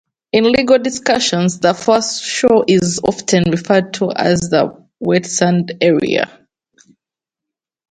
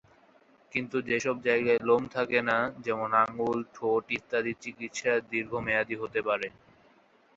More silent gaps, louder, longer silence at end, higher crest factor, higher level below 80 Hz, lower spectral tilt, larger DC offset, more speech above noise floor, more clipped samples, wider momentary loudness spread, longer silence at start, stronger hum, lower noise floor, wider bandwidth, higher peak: neither; first, -15 LUFS vs -29 LUFS; first, 1.65 s vs 0.9 s; about the same, 16 dB vs 20 dB; first, -50 dBFS vs -66 dBFS; about the same, -4.5 dB/octave vs -4.5 dB/octave; neither; first, 72 dB vs 33 dB; neither; about the same, 6 LU vs 7 LU; second, 0.35 s vs 0.75 s; neither; first, -85 dBFS vs -62 dBFS; first, 9.4 kHz vs 8 kHz; first, 0 dBFS vs -10 dBFS